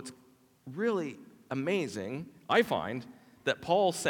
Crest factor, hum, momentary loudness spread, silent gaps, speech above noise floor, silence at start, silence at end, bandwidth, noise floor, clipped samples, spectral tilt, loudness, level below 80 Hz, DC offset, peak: 20 dB; none; 17 LU; none; 32 dB; 0 s; 0 s; 18 kHz; -63 dBFS; under 0.1%; -4.5 dB/octave; -32 LUFS; -74 dBFS; under 0.1%; -12 dBFS